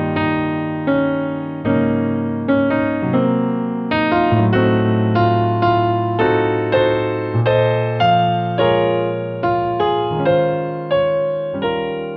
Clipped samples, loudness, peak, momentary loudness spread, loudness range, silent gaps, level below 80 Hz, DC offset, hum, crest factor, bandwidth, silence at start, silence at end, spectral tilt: under 0.1%; -17 LUFS; -4 dBFS; 6 LU; 2 LU; none; -48 dBFS; under 0.1%; none; 14 dB; 5.4 kHz; 0 s; 0 s; -9.5 dB/octave